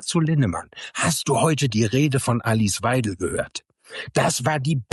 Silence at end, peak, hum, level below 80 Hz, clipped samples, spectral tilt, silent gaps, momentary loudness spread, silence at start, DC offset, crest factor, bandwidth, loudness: 0.1 s; -6 dBFS; none; -52 dBFS; under 0.1%; -5 dB/octave; none; 12 LU; 0 s; under 0.1%; 16 dB; 12.5 kHz; -22 LUFS